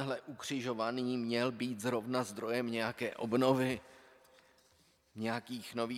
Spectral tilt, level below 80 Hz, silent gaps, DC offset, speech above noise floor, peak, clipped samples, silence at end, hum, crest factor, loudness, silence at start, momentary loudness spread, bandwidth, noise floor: -5 dB/octave; -76 dBFS; none; under 0.1%; 34 dB; -16 dBFS; under 0.1%; 0 s; none; 20 dB; -36 LUFS; 0 s; 10 LU; 15.5 kHz; -70 dBFS